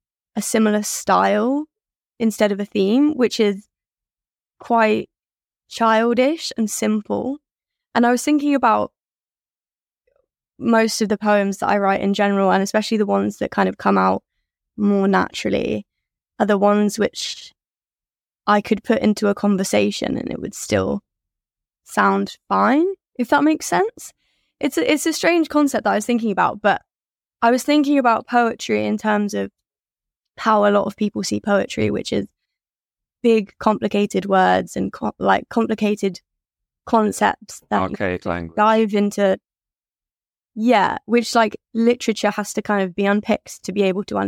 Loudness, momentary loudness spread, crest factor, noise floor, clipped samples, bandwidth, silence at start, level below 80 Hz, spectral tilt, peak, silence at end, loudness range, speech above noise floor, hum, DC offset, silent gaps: -19 LUFS; 9 LU; 18 dB; under -90 dBFS; under 0.1%; 16.5 kHz; 0.35 s; -56 dBFS; -5 dB/octave; -2 dBFS; 0 s; 3 LU; over 72 dB; none; under 0.1%; none